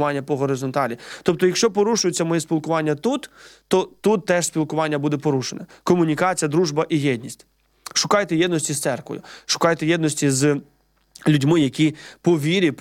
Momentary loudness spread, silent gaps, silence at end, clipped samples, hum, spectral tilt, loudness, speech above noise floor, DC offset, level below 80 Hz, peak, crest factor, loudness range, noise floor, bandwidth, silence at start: 8 LU; none; 0.05 s; under 0.1%; none; -4.5 dB/octave; -21 LUFS; 31 dB; under 0.1%; -62 dBFS; -2 dBFS; 18 dB; 1 LU; -51 dBFS; 16.5 kHz; 0 s